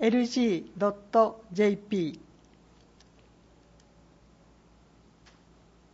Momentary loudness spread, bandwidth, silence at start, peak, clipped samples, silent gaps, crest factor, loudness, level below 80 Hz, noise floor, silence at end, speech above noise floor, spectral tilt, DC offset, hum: 7 LU; 7.8 kHz; 0 s; -10 dBFS; under 0.1%; none; 22 dB; -28 LUFS; -64 dBFS; -59 dBFS; 3.75 s; 32 dB; -6 dB/octave; under 0.1%; none